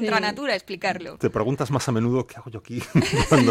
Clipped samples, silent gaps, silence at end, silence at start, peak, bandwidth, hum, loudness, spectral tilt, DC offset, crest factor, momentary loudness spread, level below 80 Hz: under 0.1%; none; 0 s; 0 s; -8 dBFS; 15.5 kHz; none; -23 LUFS; -5.5 dB/octave; under 0.1%; 16 dB; 13 LU; -44 dBFS